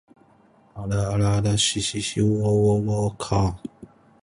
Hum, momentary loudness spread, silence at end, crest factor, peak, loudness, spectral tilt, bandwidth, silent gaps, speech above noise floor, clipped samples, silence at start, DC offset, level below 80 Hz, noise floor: none; 8 LU; 0.4 s; 16 dB; -6 dBFS; -22 LUFS; -5 dB/octave; 11.5 kHz; none; 35 dB; under 0.1%; 0.75 s; under 0.1%; -42 dBFS; -56 dBFS